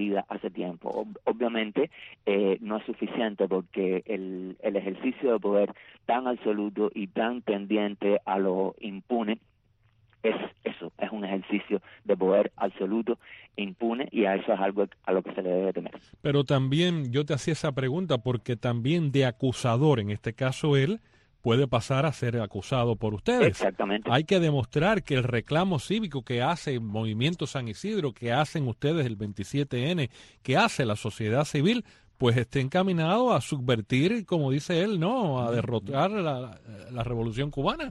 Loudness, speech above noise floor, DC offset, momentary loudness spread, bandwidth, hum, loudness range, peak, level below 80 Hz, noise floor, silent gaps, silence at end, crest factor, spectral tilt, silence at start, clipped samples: -28 LUFS; 39 dB; under 0.1%; 9 LU; 12 kHz; none; 4 LU; -8 dBFS; -56 dBFS; -66 dBFS; none; 0 s; 18 dB; -6.5 dB/octave; 0 s; under 0.1%